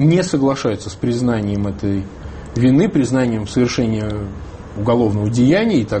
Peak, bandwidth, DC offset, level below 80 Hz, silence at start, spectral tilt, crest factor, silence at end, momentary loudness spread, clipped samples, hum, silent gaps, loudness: -2 dBFS; 8.8 kHz; under 0.1%; -38 dBFS; 0 s; -7 dB/octave; 14 dB; 0 s; 13 LU; under 0.1%; none; none; -17 LUFS